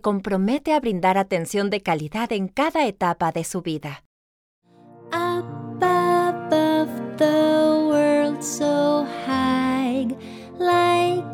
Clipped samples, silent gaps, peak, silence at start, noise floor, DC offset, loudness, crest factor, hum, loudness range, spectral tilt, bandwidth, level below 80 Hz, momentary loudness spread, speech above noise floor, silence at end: under 0.1%; 4.06-4.62 s; -6 dBFS; 0.05 s; -43 dBFS; under 0.1%; -21 LUFS; 16 dB; none; 6 LU; -5 dB/octave; 17.5 kHz; -58 dBFS; 10 LU; 20 dB; 0 s